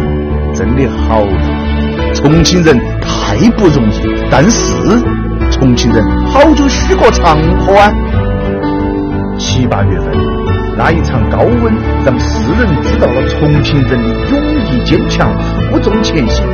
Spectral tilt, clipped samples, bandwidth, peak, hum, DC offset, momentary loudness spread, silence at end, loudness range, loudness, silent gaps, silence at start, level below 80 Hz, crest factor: -6 dB/octave; 0.9%; 7.2 kHz; 0 dBFS; none; under 0.1%; 7 LU; 0 s; 3 LU; -10 LUFS; none; 0 s; -16 dBFS; 10 dB